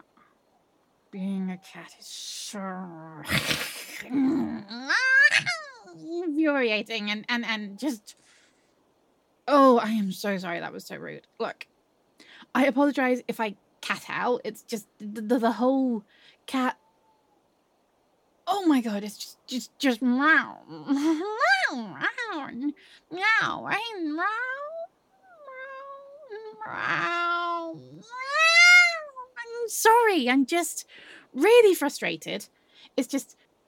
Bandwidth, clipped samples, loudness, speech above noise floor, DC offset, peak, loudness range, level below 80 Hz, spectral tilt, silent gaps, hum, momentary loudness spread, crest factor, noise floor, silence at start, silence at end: 17.5 kHz; under 0.1%; -24 LUFS; 42 dB; under 0.1%; -6 dBFS; 11 LU; -68 dBFS; -3.5 dB/octave; none; none; 21 LU; 20 dB; -68 dBFS; 1.15 s; 0.45 s